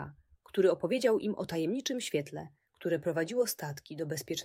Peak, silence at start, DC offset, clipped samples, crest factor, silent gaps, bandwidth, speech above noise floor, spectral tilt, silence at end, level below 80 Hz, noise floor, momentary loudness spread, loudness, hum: -14 dBFS; 0 s; under 0.1%; under 0.1%; 18 dB; none; 16 kHz; 21 dB; -4.5 dB/octave; 0 s; -70 dBFS; -53 dBFS; 13 LU; -32 LUFS; none